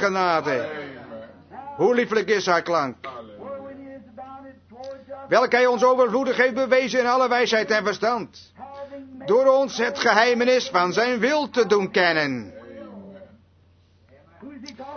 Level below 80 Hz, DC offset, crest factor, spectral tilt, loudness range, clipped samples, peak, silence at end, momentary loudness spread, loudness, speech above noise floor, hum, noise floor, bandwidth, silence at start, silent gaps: -66 dBFS; under 0.1%; 20 dB; -4 dB/octave; 6 LU; under 0.1%; -2 dBFS; 0 s; 22 LU; -20 LUFS; 37 dB; none; -57 dBFS; 6.6 kHz; 0 s; none